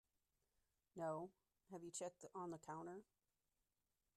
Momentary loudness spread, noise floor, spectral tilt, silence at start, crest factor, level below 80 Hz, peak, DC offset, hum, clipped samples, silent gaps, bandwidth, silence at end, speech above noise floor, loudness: 11 LU; under -90 dBFS; -5 dB/octave; 0.95 s; 18 dB; -90 dBFS; -36 dBFS; under 0.1%; none; under 0.1%; none; 13 kHz; 1.15 s; over 38 dB; -53 LUFS